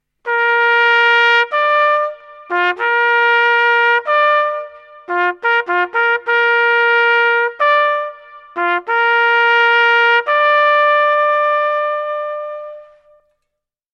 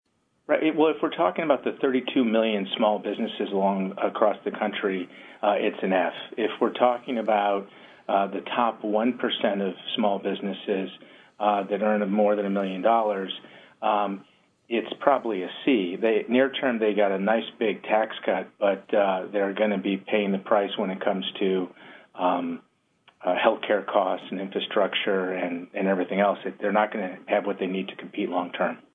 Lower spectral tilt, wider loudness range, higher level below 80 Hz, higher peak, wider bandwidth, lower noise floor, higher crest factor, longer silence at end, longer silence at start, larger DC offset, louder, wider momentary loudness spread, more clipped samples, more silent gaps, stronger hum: second, -1 dB/octave vs -8 dB/octave; about the same, 2 LU vs 2 LU; first, -74 dBFS vs -82 dBFS; first, 0 dBFS vs -4 dBFS; first, 7.4 kHz vs 4 kHz; first, -77 dBFS vs -62 dBFS; second, 14 dB vs 20 dB; first, 1.1 s vs 0.15 s; second, 0.25 s vs 0.5 s; neither; first, -13 LUFS vs -25 LUFS; first, 11 LU vs 7 LU; neither; neither; neither